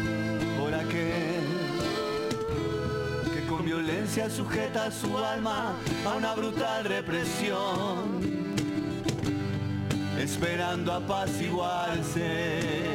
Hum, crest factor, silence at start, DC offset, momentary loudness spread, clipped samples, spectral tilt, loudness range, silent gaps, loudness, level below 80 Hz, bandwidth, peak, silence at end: none; 16 dB; 0 s; under 0.1%; 2 LU; under 0.1%; -5 dB/octave; 1 LU; none; -30 LUFS; -52 dBFS; 17 kHz; -14 dBFS; 0 s